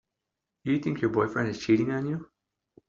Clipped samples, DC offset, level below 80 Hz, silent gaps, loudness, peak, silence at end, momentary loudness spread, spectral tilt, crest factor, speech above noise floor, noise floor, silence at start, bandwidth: under 0.1%; under 0.1%; -62 dBFS; none; -28 LUFS; -10 dBFS; 0.65 s; 9 LU; -6.5 dB/octave; 18 dB; 59 dB; -86 dBFS; 0.65 s; 7.6 kHz